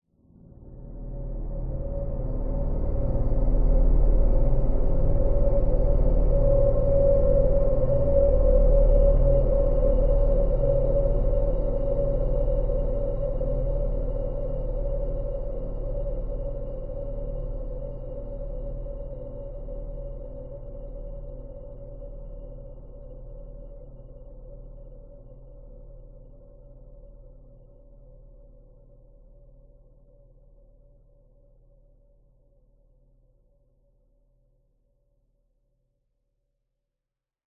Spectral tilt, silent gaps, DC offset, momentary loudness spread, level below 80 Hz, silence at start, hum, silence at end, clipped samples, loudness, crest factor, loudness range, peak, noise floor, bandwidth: -13.5 dB/octave; none; under 0.1%; 23 LU; -28 dBFS; 0.6 s; none; 10.2 s; under 0.1%; -27 LUFS; 16 dB; 22 LU; -8 dBFS; -87 dBFS; 1.8 kHz